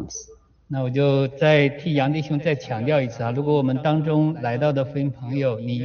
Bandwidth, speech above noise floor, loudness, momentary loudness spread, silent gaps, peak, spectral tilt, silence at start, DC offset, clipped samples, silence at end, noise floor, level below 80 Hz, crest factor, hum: 6.8 kHz; 27 dB; -22 LUFS; 7 LU; none; -6 dBFS; -6.5 dB/octave; 0 s; under 0.1%; under 0.1%; 0 s; -48 dBFS; -56 dBFS; 16 dB; none